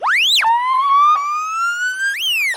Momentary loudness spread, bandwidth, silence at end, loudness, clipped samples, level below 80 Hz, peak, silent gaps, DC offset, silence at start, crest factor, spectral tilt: 7 LU; 17 kHz; 0 s; -15 LUFS; under 0.1%; -72 dBFS; -6 dBFS; none; under 0.1%; 0 s; 10 dB; 4 dB/octave